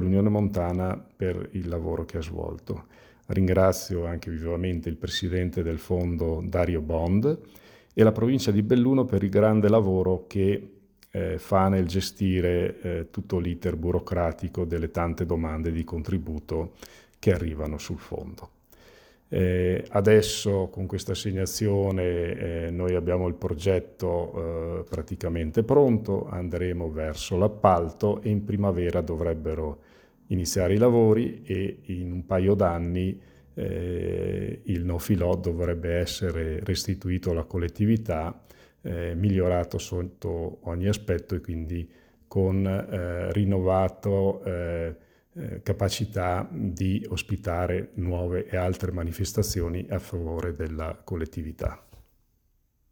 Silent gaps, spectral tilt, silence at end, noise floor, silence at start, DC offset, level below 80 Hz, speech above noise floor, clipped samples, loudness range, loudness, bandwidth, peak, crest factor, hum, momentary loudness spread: none; -6.5 dB/octave; 0.9 s; -68 dBFS; 0 s; under 0.1%; -42 dBFS; 42 dB; under 0.1%; 6 LU; -27 LUFS; over 20 kHz; -4 dBFS; 22 dB; none; 11 LU